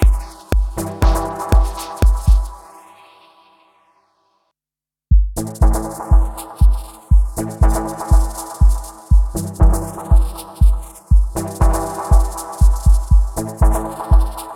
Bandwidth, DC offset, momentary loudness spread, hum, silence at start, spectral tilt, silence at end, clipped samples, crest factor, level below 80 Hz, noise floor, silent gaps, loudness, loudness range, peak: 14.5 kHz; under 0.1%; 7 LU; none; 0 s; -6.5 dB/octave; 0 s; under 0.1%; 14 dB; -16 dBFS; -89 dBFS; none; -18 LUFS; 6 LU; 0 dBFS